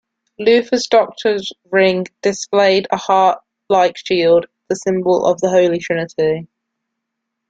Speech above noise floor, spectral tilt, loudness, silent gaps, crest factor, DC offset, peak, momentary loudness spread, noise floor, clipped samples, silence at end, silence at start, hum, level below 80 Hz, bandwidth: 62 dB; -4.5 dB/octave; -16 LUFS; none; 14 dB; under 0.1%; -2 dBFS; 7 LU; -77 dBFS; under 0.1%; 1.05 s; 0.4 s; none; -58 dBFS; 9 kHz